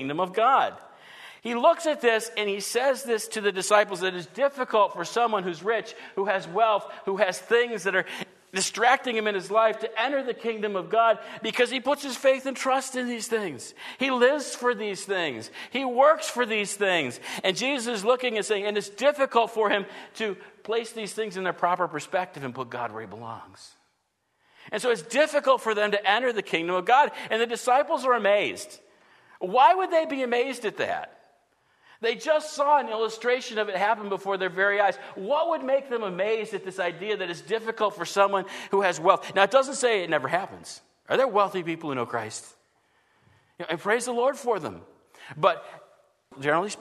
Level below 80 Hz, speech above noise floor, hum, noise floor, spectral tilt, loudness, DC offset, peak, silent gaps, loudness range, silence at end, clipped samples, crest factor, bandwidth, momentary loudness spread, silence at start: -80 dBFS; 48 dB; none; -74 dBFS; -3 dB/octave; -25 LUFS; under 0.1%; -4 dBFS; none; 5 LU; 0 s; under 0.1%; 22 dB; 13.5 kHz; 11 LU; 0 s